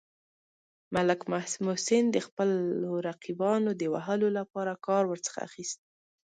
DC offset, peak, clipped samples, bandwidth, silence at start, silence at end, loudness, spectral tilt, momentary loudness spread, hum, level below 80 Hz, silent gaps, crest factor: under 0.1%; -12 dBFS; under 0.1%; 9.6 kHz; 0.9 s; 0.55 s; -30 LUFS; -5 dB/octave; 10 LU; none; -72 dBFS; 2.32-2.37 s; 18 dB